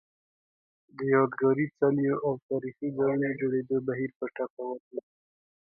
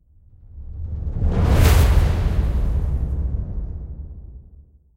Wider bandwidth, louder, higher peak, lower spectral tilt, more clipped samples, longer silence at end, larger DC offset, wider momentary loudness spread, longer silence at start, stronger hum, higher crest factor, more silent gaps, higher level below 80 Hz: second, 4.8 kHz vs 16 kHz; second, -29 LUFS vs -21 LUFS; second, -12 dBFS vs -2 dBFS; first, -12 dB/octave vs -6.5 dB/octave; neither; first, 0.8 s vs 0.55 s; neither; second, 11 LU vs 22 LU; first, 0.95 s vs 0.55 s; neither; about the same, 18 dB vs 18 dB; first, 2.42-2.49 s, 4.16-4.20 s, 4.50-4.57 s, 4.80-4.91 s vs none; second, -72 dBFS vs -22 dBFS